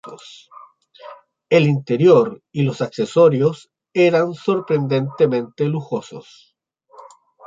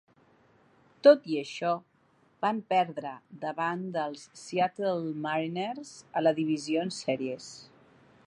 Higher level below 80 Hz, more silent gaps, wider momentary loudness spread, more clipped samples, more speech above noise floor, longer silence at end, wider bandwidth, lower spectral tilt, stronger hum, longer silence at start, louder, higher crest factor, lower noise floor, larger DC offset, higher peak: first, -66 dBFS vs -80 dBFS; neither; about the same, 14 LU vs 15 LU; neither; about the same, 38 dB vs 37 dB; first, 1.25 s vs 0.65 s; second, 7.8 kHz vs 11 kHz; first, -7.5 dB/octave vs -5.5 dB/octave; neither; second, 0.05 s vs 1.05 s; first, -18 LUFS vs -29 LUFS; second, 16 dB vs 22 dB; second, -55 dBFS vs -66 dBFS; neither; first, -2 dBFS vs -8 dBFS